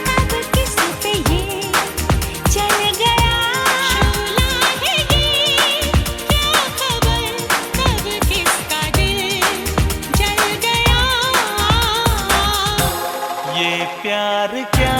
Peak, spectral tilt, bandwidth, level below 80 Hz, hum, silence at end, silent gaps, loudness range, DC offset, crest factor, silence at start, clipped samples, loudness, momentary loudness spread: 0 dBFS; -3 dB/octave; 17.5 kHz; -26 dBFS; none; 0 s; none; 2 LU; under 0.1%; 16 dB; 0 s; under 0.1%; -16 LUFS; 5 LU